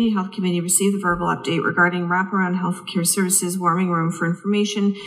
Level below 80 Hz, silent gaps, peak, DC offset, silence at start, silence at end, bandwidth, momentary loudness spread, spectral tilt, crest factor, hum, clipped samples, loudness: -54 dBFS; none; -2 dBFS; under 0.1%; 0 s; 0 s; 15.5 kHz; 5 LU; -4 dB/octave; 18 dB; none; under 0.1%; -20 LUFS